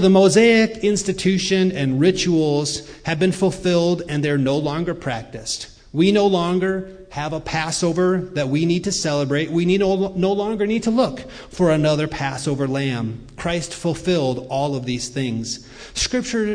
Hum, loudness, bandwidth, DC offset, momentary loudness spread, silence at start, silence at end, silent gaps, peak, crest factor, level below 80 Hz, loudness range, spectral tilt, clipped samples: none; -20 LUFS; 10.5 kHz; under 0.1%; 10 LU; 0 s; 0 s; none; -4 dBFS; 16 dB; -44 dBFS; 4 LU; -5 dB/octave; under 0.1%